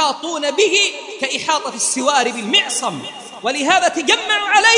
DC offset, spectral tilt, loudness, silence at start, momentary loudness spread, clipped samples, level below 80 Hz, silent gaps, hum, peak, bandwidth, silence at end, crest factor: under 0.1%; -0.5 dB/octave; -16 LUFS; 0 s; 10 LU; under 0.1%; -66 dBFS; none; none; 0 dBFS; 11 kHz; 0 s; 16 dB